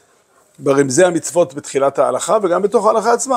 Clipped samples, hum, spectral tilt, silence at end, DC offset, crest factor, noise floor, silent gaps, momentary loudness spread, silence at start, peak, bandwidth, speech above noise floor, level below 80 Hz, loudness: under 0.1%; none; -4.5 dB/octave; 0 s; under 0.1%; 16 dB; -54 dBFS; none; 5 LU; 0.6 s; 0 dBFS; 15.5 kHz; 39 dB; -66 dBFS; -15 LUFS